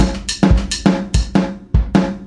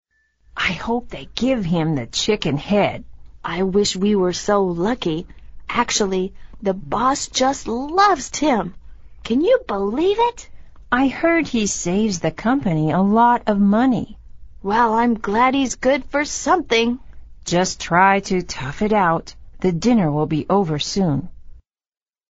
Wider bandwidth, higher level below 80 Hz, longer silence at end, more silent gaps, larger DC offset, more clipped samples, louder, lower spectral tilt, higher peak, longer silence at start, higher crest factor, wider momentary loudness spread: first, 11.5 kHz vs 8 kHz; first, -20 dBFS vs -42 dBFS; second, 0 s vs 0.7 s; neither; neither; neither; about the same, -17 LUFS vs -19 LUFS; about the same, -5.5 dB/octave vs -4.5 dB/octave; about the same, 0 dBFS vs -2 dBFS; second, 0 s vs 0.55 s; about the same, 14 dB vs 18 dB; second, 4 LU vs 9 LU